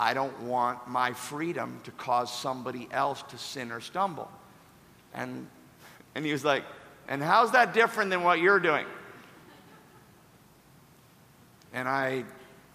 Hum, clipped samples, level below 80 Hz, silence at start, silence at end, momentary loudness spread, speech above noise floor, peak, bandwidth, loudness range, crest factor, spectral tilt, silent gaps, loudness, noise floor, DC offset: none; under 0.1%; -74 dBFS; 0 s; 0.2 s; 20 LU; 29 dB; -8 dBFS; 15.5 kHz; 12 LU; 22 dB; -4.5 dB/octave; none; -28 LUFS; -58 dBFS; under 0.1%